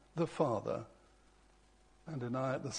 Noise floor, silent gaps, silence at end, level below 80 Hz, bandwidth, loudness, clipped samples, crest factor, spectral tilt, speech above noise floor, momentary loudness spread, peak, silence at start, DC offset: -66 dBFS; none; 0 s; -68 dBFS; 10 kHz; -38 LUFS; under 0.1%; 22 dB; -6 dB/octave; 29 dB; 17 LU; -18 dBFS; 0.15 s; under 0.1%